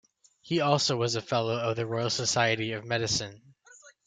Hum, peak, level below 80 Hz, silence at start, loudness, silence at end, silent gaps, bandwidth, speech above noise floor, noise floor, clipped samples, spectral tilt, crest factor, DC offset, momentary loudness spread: none; -8 dBFS; -64 dBFS; 0.45 s; -28 LUFS; 0.15 s; none; 9.4 kHz; 28 dB; -56 dBFS; under 0.1%; -3.5 dB/octave; 22 dB; under 0.1%; 6 LU